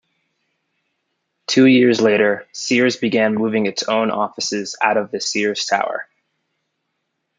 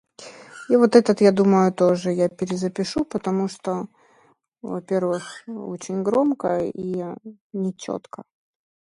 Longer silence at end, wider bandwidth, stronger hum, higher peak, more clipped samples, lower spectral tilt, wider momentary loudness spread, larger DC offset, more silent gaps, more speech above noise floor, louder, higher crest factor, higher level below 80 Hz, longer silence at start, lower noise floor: first, 1.35 s vs 0.75 s; second, 9.4 kHz vs 11.5 kHz; neither; about the same, -2 dBFS vs -2 dBFS; neither; second, -4 dB/octave vs -6.5 dB/octave; second, 10 LU vs 23 LU; neither; second, none vs 7.41-7.50 s; first, 57 dB vs 39 dB; first, -17 LUFS vs -22 LUFS; about the same, 16 dB vs 20 dB; about the same, -68 dBFS vs -64 dBFS; first, 1.5 s vs 0.2 s; first, -74 dBFS vs -60 dBFS